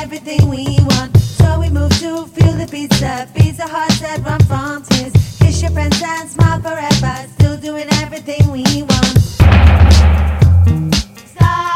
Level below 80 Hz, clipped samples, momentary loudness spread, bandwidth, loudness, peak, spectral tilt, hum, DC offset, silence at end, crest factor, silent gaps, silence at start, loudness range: -20 dBFS; under 0.1%; 10 LU; 15.5 kHz; -13 LUFS; 0 dBFS; -5.5 dB/octave; none; under 0.1%; 0 s; 12 dB; none; 0 s; 4 LU